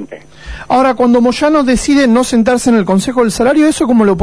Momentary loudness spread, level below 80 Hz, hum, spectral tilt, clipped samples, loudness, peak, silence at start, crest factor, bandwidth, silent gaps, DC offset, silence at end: 4 LU; -34 dBFS; none; -5 dB/octave; under 0.1%; -10 LUFS; -2 dBFS; 0 s; 8 dB; 11 kHz; none; 0.8%; 0 s